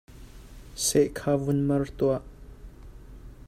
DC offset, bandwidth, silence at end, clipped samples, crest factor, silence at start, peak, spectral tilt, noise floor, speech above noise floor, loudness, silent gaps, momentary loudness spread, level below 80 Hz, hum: under 0.1%; 15.5 kHz; 0 s; under 0.1%; 18 dB; 0.15 s; -10 dBFS; -5 dB/octave; -45 dBFS; 20 dB; -26 LUFS; none; 6 LU; -46 dBFS; none